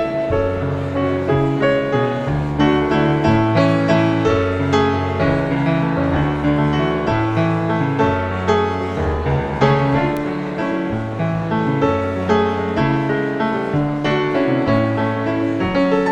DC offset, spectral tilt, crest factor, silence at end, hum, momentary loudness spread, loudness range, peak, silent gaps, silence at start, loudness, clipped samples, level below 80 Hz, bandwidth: under 0.1%; -8 dB/octave; 16 dB; 0 s; none; 5 LU; 3 LU; -2 dBFS; none; 0 s; -18 LUFS; under 0.1%; -36 dBFS; 8.6 kHz